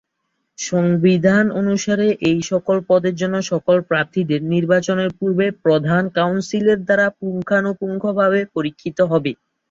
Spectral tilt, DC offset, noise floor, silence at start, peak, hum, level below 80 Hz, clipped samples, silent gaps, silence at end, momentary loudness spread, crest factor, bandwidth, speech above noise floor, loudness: -6 dB/octave; under 0.1%; -73 dBFS; 0.6 s; -2 dBFS; none; -58 dBFS; under 0.1%; none; 0.35 s; 7 LU; 14 dB; 7.6 kHz; 55 dB; -18 LUFS